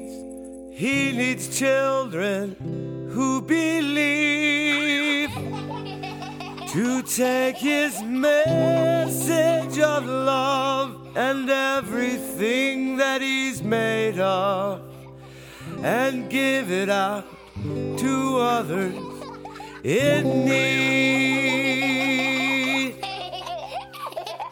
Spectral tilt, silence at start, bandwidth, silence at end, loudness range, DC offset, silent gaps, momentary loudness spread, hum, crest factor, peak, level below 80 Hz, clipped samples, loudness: -4 dB/octave; 0 s; over 20 kHz; 0 s; 4 LU; under 0.1%; none; 14 LU; none; 16 dB; -6 dBFS; -58 dBFS; under 0.1%; -22 LUFS